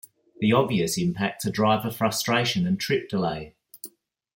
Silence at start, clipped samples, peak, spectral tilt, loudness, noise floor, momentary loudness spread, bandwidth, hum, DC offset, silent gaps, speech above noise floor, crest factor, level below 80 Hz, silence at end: 0.4 s; under 0.1%; -6 dBFS; -5 dB/octave; -24 LUFS; -47 dBFS; 20 LU; 17 kHz; none; under 0.1%; none; 23 dB; 20 dB; -60 dBFS; 0.5 s